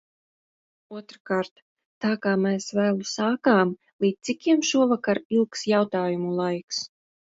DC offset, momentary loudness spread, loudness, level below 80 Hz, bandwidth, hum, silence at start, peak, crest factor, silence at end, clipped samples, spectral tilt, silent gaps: under 0.1%; 11 LU; -24 LUFS; -72 dBFS; 8 kHz; none; 0.9 s; -8 dBFS; 18 dB; 0.45 s; under 0.1%; -5 dB/octave; 1.20-1.25 s, 1.51-1.56 s, 1.62-1.76 s, 1.85-2.01 s, 3.93-3.99 s, 5.25-5.30 s, 6.64-6.68 s